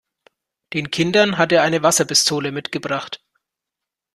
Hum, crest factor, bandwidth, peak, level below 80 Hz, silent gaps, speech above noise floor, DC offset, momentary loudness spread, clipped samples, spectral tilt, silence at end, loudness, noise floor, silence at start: none; 18 dB; 14 kHz; -2 dBFS; -60 dBFS; none; 67 dB; under 0.1%; 12 LU; under 0.1%; -3 dB/octave; 1 s; -18 LUFS; -85 dBFS; 0.7 s